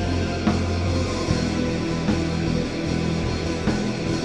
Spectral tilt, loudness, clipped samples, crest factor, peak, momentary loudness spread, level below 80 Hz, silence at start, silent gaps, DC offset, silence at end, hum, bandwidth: -6 dB/octave; -24 LUFS; under 0.1%; 14 dB; -8 dBFS; 2 LU; -32 dBFS; 0 s; none; 0.4%; 0 s; none; 11.5 kHz